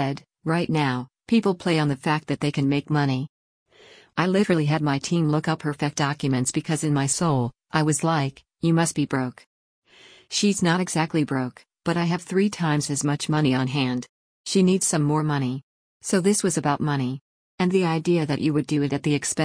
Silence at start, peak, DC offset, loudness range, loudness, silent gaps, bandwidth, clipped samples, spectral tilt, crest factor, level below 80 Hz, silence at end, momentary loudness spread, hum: 0 s; -8 dBFS; under 0.1%; 2 LU; -23 LUFS; 3.29-3.66 s, 9.47-9.82 s, 14.09-14.44 s, 15.63-16.00 s, 17.21-17.58 s; 10.5 kHz; under 0.1%; -5 dB/octave; 16 dB; -60 dBFS; 0 s; 7 LU; none